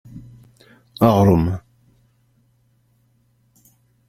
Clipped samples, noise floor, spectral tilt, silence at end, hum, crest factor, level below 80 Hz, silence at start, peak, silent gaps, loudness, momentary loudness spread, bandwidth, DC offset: under 0.1%; -61 dBFS; -8.5 dB/octave; 2.5 s; none; 20 dB; -46 dBFS; 0.15 s; -2 dBFS; none; -17 LUFS; 28 LU; 16 kHz; under 0.1%